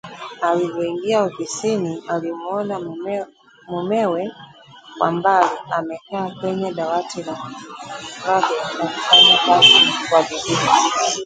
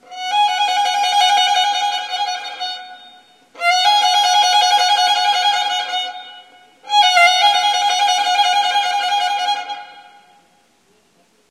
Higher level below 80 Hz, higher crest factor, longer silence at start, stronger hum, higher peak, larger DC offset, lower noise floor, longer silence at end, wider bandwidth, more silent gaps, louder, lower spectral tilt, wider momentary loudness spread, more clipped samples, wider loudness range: first, -62 dBFS vs -74 dBFS; about the same, 18 dB vs 16 dB; about the same, 0.05 s vs 0.1 s; neither; about the same, 0 dBFS vs 0 dBFS; neither; second, -42 dBFS vs -57 dBFS; second, 0 s vs 1.5 s; second, 9.6 kHz vs 15.5 kHz; neither; about the same, -17 LUFS vs -15 LUFS; first, -2.5 dB/octave vs 3.5 dB/octave; first, 20 LU vs 11 LU; neither; first, 11 LU vs 3 LU